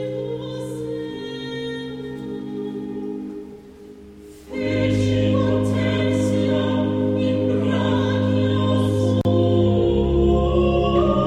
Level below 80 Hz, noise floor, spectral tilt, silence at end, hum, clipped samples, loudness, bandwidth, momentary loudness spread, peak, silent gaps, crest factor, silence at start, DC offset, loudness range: -34 dBFS; -42 dBFS; -7.5 dB/octave; 0 s; none; under 0.1%; -21 LUFS; 11 kHz; 12 LU; -6 dBFS; none; 14 dB; 0 s; under 0.1%; 11 LU